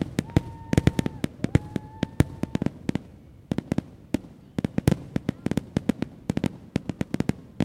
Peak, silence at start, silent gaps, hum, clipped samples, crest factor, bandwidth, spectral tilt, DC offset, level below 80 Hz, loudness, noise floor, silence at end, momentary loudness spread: -2 dBFS; 0 s; none; none; under 0.1%; 26 dB; 16.5 kHz; -7 dB/octave; under 0.1%; -42 dBFS; -29 LUFS; -48 dBFS; 0 s; 8 LU